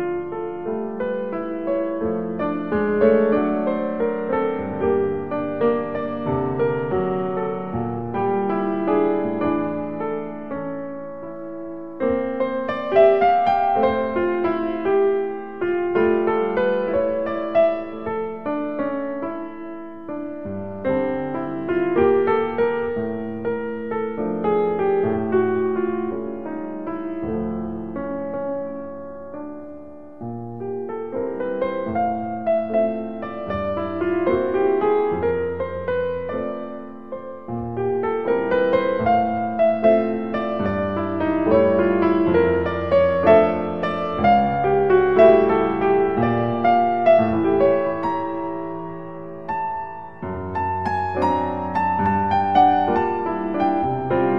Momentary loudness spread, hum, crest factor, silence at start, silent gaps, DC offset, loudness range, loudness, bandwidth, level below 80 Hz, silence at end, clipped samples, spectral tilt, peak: 14 LU; none; 20 dB; 0 s; none; 0.7%; 9 LU; -21 LUFS; 5.8 kHz; -50 dBFS; 0 s; under 0.1%; -9.5 dB/octave; -2 dBFS